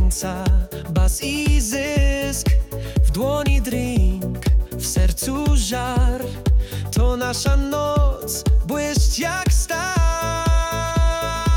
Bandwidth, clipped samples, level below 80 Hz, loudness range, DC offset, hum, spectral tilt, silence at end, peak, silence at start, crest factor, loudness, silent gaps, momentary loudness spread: 18 kHz; under 0.1%; -20 dBFS; 1 LU; under 0.1%; none; -5 dB/octave; 0 s; -8 dBFS; 0 s; 10 dB; -21 LUFS; none; 3 LU